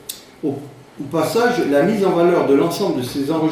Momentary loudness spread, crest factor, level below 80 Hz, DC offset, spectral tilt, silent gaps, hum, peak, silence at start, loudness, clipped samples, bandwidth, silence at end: 11 LU; 14 dB; -56 dBFS; under 0.1%; -6 dB/octave; none; none; -4 dBFS; 0.1 s; -18 LUFS; under 0.1%; 15.5 kHz; 0 s